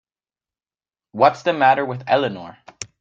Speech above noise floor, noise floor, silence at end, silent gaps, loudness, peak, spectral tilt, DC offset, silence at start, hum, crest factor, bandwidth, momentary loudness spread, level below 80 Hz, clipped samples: over 72 dB; under -90 dBFS; 0.15 s; none; -18 LUFS; -2 dBFS; -4.5 dB/octave; under 0.1%; 1.15 s; none; 20 dB; 9.2 kHz; 19 LU; -66 dBFS; under 0.1%